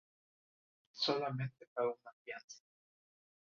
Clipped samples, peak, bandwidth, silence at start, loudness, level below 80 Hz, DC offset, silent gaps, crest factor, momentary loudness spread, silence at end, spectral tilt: under 0.1%; -22 dBFS; 7.4 kHz; 0.95 s; -40 LUFS; -82 dBFS; under 0.1%; 1.68-1.76 s, 2.13-2.25 s, 2.44-2.48 s; 22 dB; 21 LU; 0.95 s; -3.5 dB/octave